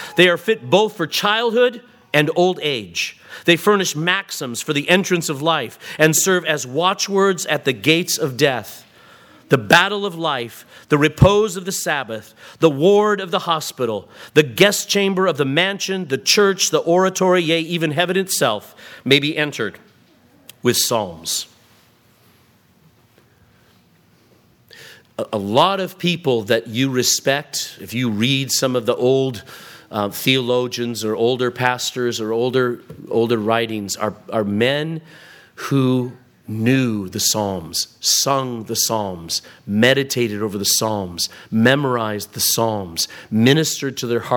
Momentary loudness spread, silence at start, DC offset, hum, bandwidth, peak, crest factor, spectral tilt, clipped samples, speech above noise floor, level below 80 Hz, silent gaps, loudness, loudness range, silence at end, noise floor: 10 LU; 0 s; under 0.1%; none; 19 kHz; 0 dBFS; 20 dB; -3.5 dB/octave; under 0.1%; 36 dB; -48 dBFS; none; -18 LUFS; 5 LU; 0 s; -55 dBFS